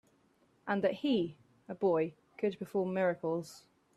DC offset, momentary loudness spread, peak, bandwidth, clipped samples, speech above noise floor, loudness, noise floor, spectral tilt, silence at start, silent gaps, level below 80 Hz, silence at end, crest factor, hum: under 0.1%; 9 LU; -18 dBFS; 14 kHz; under 0.1%; 37 dB; -34 LUFS; -70 dBFS; -6.5 dB/octave; 0.65 s; none; -76 dBFS; 0.35 s; 16 dB; none